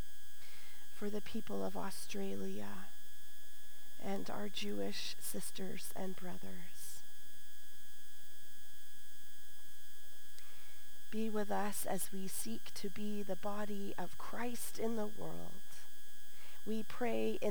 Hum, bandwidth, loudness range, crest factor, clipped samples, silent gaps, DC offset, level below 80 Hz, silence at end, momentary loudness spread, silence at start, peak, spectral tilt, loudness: none; over 20 kHz; 13 LU; 18 dB; under 0.1%; none; 3%; -74 dBFS; 0 s; 17 LU; 0 s; -22 dBFS; -4 dB/octave; -43 LUFS